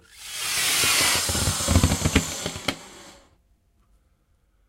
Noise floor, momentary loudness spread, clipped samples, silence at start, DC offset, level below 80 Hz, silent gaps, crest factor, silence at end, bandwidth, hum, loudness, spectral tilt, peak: -64 dBFS; 13 LU; under 0.1%; 0.15 s; under 0.1%; -36 dBFS; none; 24 dB; 1.55 s; 16 kHz; none; -22 LUFS; -2.5 dB/octave; -2 dBFS